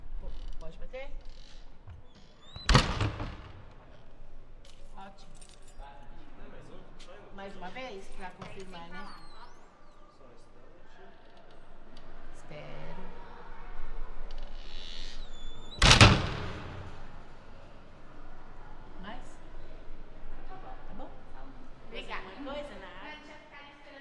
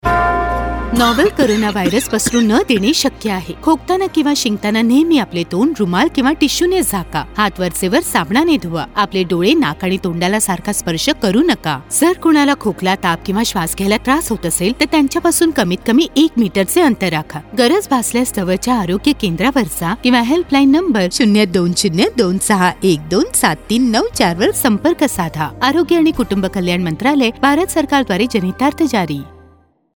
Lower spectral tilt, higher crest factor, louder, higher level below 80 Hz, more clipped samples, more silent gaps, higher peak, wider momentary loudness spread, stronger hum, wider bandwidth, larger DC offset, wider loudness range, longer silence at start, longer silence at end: about the same, -4 dB/octave vs -4 dB/octave; first, 28 dB vs 14 dB; second, -28 LUFS vs -14 LUFS; about the same, -40 dBFS vs -36 dBFS; neither; neither; second, -4 dBFS vs 0 dBFS; first, 23 LU vs 5 LU; neither; second, 11.5 kHz vs over 20 kHz; neither; first, 24 LU vs 2 LU; about the same, 0 s vs 0.05 s; second, 0 s vs 0.65 s